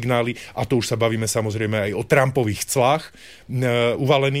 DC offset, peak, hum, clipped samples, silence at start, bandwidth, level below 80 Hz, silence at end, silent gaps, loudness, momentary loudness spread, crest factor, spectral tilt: 0.2%; -4 dBFS; none; under 0.1%; 0 s; 16 kHz; -52 dBFS; 0 s; none; -21 LUFS; 6 LU; 16 dB; -5 dB/octave